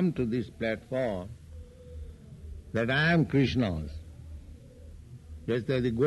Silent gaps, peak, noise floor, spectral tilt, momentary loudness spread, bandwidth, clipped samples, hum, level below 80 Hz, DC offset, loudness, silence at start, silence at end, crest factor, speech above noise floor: none; -14 dBFS; -48 dBFS; -7.5 dB/octave; 24 LU; 12 kHz; under 0.1%; none; -48 dBFS; under 0.1%; -29 LUFS; 0 s; 0 s; 16 dB; 20 dB